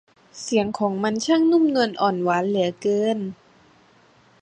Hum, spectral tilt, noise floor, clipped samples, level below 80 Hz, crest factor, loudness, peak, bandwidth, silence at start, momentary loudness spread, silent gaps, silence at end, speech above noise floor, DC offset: none; -5 dB/octave; -56 dBFS; under 0.1%; -64 dBFS; 16 dB; -21 LUFS; -6 dBFS; 9.6 kHz; 0.35 s; 7 LU; none; 1.05 s; 35 dB; under 0.1%